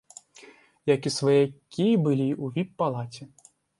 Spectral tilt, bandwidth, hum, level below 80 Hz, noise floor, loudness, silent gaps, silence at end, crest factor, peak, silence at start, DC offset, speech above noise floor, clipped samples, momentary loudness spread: -6.5 dB/octave; 11.5 kHz; none; -70 dBFS; -53 dBFS; -25 LUFS; none; 0.55 s; 18 dB; -8 dBFS; 0.45 s; under 0.1%; 28 dB; under 0.1%; 14 LU